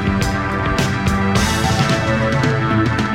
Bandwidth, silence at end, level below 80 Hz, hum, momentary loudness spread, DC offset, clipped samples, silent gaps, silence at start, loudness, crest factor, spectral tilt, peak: 16.5 kHz; 0 s; -30 dBFS; none; 3 LU; under 0.1%; under 0.1%; none; 0 s; -17 LUFS; 16 dB; -5.5 dB/octave; -2 dBFS